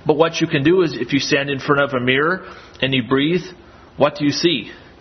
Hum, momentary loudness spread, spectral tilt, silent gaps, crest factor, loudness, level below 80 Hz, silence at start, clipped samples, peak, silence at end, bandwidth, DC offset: none; 7 LU; -5 dB/octave; none; 18 dB; -18 LUFS; -52 dBFS; 0.05 s; under 0.1%; 0 dBFS; 0.2 s; 6.4 kHz; under 0.1%